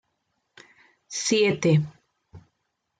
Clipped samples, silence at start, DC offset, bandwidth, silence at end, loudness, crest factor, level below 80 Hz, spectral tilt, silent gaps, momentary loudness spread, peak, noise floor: under 0.1%; 1.1 s; under 0.1%; 9.4 kHz; 0.6 s; -23 LUFS; 18 dB; -66 dBFS; -5 dB/octave; none; 14 LU; -10 dBFS; -77 dBFS